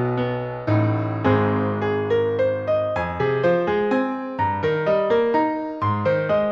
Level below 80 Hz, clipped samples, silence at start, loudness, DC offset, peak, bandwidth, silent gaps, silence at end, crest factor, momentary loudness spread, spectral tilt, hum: -52 dBFS; under 0.1%; 0 s; -21 LUFS; under 0.1%; -6 dBFS; 6.8 kHz; none; 0 s; 14 dB; 5 LU; -9 dB/octave; none